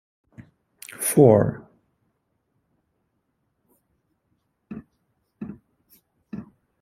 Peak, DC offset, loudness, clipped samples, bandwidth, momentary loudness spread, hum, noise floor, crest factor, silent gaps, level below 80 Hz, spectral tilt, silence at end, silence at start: -2 dBFS; under 0.1%; -18 LUFS; under 0.1%; 16 kHz; 26 LU; none; -74 dBFS; 24 dB; none; -60 dBFS; -6.5 dB/octave; 0.4 s; 0.4 s